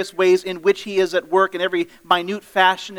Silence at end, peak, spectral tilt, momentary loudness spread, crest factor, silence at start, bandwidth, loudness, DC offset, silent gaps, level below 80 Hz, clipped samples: 0 s; 0 dBFS; -4 dB/octave; 5 LU; 18 dB; 0 s; 16 kHz; -19 LUFS; under 0.1%; none; -66 dBFS; under 0.1%